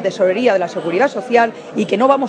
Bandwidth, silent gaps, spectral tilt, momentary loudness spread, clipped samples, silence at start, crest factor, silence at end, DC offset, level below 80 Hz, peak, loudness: 9.6 kHz; none; -5.5 dB/octave; 5 LU; under 0.1%; 0 s; 14 dB; 0 s; under 0.1%; -68 dBFS; 0 dBFS; -16 LUFS